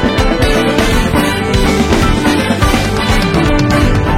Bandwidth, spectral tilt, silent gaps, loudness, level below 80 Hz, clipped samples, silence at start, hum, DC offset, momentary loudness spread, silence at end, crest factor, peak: 16.5 kHz; -5.5 dB/octave; none; -12 LUFS; -18 dBFS; under 0.1%; 0 s; none; under 0.1%; 2 LU; 0 s; 10 dB; 0 dBFS